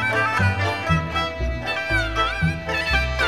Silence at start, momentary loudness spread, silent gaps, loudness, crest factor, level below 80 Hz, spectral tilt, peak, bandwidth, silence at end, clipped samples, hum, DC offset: 0 s; 5 LU; none; -22 LUFS; 14 dB; -32 dBFS; -5 dB/octave; -6 dBFS; 14.5 kHz; 0 s; under 0.1%; none; 0.4%